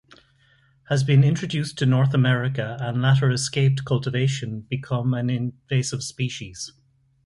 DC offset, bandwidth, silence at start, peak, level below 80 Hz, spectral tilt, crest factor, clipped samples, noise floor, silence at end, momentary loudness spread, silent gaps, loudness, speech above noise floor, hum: under 0.1%; 11.5 kHz; 0.9 s; -6 dBFS; -56 dBFS; -6 dB/octave; 16 dB; under 0.1%; -59 dBFS; 0.55 s; 11 LU; none; -23 LUFS; 38 dB; none